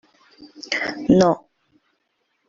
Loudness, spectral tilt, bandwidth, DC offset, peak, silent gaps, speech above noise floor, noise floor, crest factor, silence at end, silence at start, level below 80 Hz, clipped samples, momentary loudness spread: -19 LUFS; -6 dB/octave; 7.6 kHz; under 0.1%; -2 dBFS; none; 52 dB; -71 dBFS; 20 dB; 1.1 s; 0.4 s; -54 dBFS; under 0.1%; 12 LU